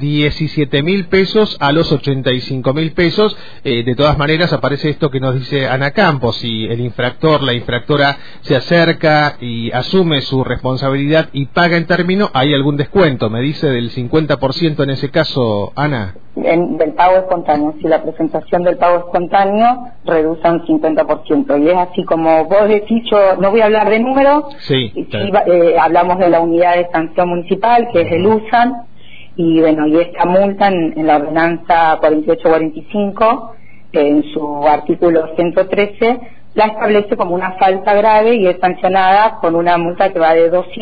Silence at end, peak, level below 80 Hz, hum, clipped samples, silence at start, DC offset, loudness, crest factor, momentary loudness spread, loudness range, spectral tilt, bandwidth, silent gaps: 0 s; 0 dBFS; -40 dBFS; none; under 0.1%; 0 s; 4%; -13 LUFS; 12 dB; 7 LU; 3 LU; -8 dB/octave; 5 kHz; none